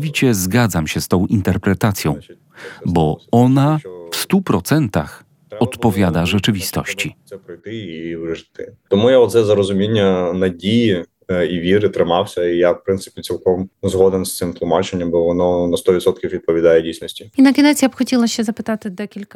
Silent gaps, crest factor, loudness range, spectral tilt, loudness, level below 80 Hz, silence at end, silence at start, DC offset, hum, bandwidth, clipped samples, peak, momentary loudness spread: none; 16 dB; 4 LU; -5.5 dB/octave; -17 LUFS; -46 dBFS; 0.1 s; 0 s; under 0.1%; none; 17.5 kHz; under 0.1%; 0 dBFS; 13 LU